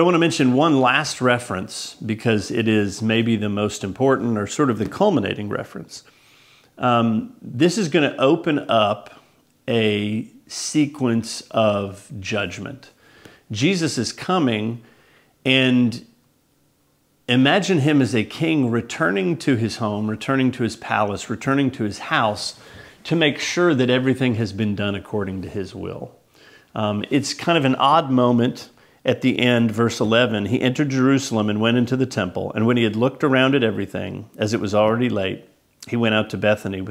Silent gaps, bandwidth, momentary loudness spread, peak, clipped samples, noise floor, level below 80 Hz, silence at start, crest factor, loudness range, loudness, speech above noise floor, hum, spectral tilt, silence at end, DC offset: none; 15 kHz; 12 LU; 0 dBFS; under 0.1%; -62 dBFS; -60 dBFS; 0 s; 20 dB; 4 LU; -20 LUFS; 42 dB; none; -5.5 dB/octave; 0 s; under 0.1%